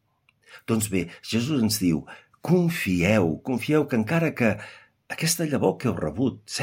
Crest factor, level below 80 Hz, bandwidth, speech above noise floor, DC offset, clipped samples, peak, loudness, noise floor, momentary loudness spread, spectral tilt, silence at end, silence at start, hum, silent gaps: 18 dB; -56 dBFS; 16.5 kHz; 38 dB; under 0.1%; under 0.1%; -6 dBFS; -24 LUFS; -62 dBFS; 9 LU; -5 dB/octave; 0 s; 0.5 s; none; none